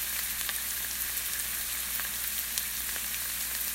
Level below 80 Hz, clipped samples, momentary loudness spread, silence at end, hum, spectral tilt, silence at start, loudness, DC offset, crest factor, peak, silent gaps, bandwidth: -54 dBFS; under 0.1%; 1 LU; 0 s; none; 1 dB/octave; 0 s; -30 LUFS; under 0.1%; 28 dB; -6 dBFS; none; 16.5 kHz